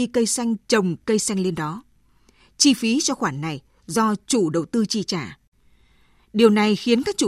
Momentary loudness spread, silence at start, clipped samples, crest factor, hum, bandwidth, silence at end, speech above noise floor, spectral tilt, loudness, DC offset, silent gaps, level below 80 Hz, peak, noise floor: 12 LU; 0 s; under 0.1%; 20 dB; none; 14.5 kHz; 0 s; 37 dB; -4 dB/octave; -21 LUFS; under 0.1%; 5.47-5.52 s; -58 dBFS; -2 dBFS; -57 dBFS